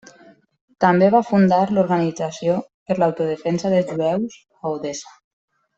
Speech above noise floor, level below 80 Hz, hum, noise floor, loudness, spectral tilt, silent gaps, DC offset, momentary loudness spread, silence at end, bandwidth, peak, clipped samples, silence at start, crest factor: 32 dB; -62 dBFS; none; -50 dBFS; -19 LUFS; -7 dB/octave; 2.74-2.86 s; under 0.1%; 12 LU; 0.75 s; 8 kHz; -2 dBFS; under 0.1%; 0.8 s; 18 dB